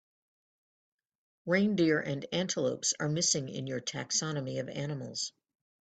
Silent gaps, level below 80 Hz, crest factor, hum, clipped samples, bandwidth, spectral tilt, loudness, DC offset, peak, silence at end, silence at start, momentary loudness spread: none; -72 dBFS; 18 dB; none; under 0.1%; 9.4 kHz; -3.5 dB/octave; -31 LUFS; under 0.1%; -14 dBFS; 0.55 s; 1.45 s; 9 LU